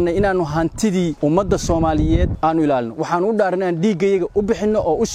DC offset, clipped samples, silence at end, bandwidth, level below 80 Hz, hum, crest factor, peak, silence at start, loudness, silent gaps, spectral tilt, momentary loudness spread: under 0.1%; under 0.1%; 0 s; 15 kHz; -30 dBFS; none; 14 dB; -4 dBFS; 0 s; -18 LUFS; none; -6.5 dB/octave; 2 LU